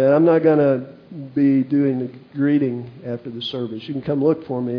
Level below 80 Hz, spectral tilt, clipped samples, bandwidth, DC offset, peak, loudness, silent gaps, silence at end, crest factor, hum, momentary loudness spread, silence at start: -64 dBFS; -9.5 dB/octave; under 0.1%; 5.4 kHz; under 0.1%; -4 dBFS; -19 LUFS; none; 0 s; 14 dB; none; 16 LU; 0 s